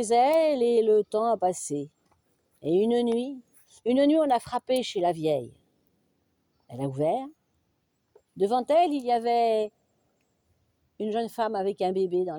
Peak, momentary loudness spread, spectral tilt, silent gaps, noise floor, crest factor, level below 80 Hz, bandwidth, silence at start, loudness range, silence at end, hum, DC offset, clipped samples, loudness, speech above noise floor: -12 dBFS; 13 LU; -5.5 dB/octave; none; -74 dBFS; 14 dB; -72 dBFS; 19.5 kHz; 0 s; 5 LU; 0 s; none; under 0.1%; under 0.1%; -26 LUFS; 49 dB